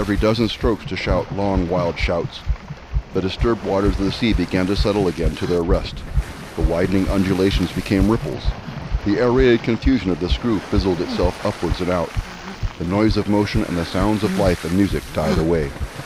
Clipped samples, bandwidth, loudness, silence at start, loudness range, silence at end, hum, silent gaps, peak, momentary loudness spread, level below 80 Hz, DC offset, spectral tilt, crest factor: under 0.1%; 15 kHz; -20 LUFS; 0 s; 2 LU; 0 s; none; none; -2 dBFS; 9 LU; -28 dBFS; under 0.1%; -6.5 dB/octave; 16 dB